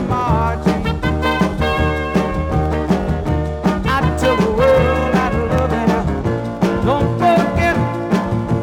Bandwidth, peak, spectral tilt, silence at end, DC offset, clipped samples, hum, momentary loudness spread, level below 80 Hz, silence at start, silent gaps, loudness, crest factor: 16.5 kHz; -2 dBFS; -7 dB/octave; 0 s; under 0.1%; under 0.1%; none; 5 LU; -28 dBFS; 0 s; none; -17 LUFS; 14 dB